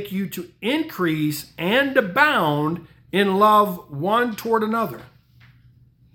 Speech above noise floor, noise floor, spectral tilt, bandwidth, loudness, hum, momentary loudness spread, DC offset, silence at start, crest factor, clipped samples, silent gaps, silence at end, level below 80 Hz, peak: 33 dB; -53 dBFS; -5.5 dB/octave; 18 kHz; -20 LUFS; none; 12 LU; under 0.1%; 0 s; 20 dB; under 0.1%; none; 1.1 s; -60 dBFS; -2 dBFS